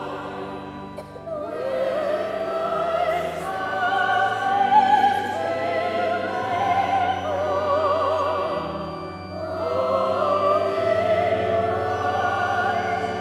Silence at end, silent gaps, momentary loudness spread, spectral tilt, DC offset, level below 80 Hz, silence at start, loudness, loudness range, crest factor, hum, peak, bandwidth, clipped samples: 0 s; none; 12 LU; -5.5 dB/octave; under 0.1%; -56 dBFS; 0 s; -23 LUFS; 4 LU; 18 dB; none; -6 dBFS; 14 kHz; under 0.1%